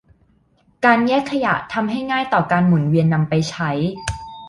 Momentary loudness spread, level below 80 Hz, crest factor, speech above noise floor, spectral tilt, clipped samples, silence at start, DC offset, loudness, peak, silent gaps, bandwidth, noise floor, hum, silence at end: 7 LU; -44 dBFS; 16 dB; 41 dB; -6.5 dB/octave; under 0.1%; 0.8 s; under 0.1%; -18 LUFS; -2 dBFS; none; 11 kHz; -58 dBFS; none; 0 s